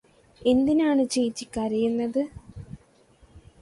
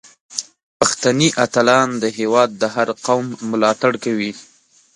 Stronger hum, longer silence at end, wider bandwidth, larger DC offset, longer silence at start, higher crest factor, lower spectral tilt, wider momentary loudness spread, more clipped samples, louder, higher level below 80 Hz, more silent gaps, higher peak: neither; second, 0.2 s vs 0.55 s; about the same, 11.5 kHz vs 11.5 kHz; neither; about the same, 0.4 s vs 0.3 s; about the same, 16 dB vs 18 dB; first, -5 dB/octave vs -3.5 dB/octave; first, 22 LU vs 13 LU; neither; second, -25 LUFS vs -17 LUFS; first, -54 dBFS vs -60 dBFS; second, none vs 0.63-0.80 s; second, -10 dBFS vs 0 dBFS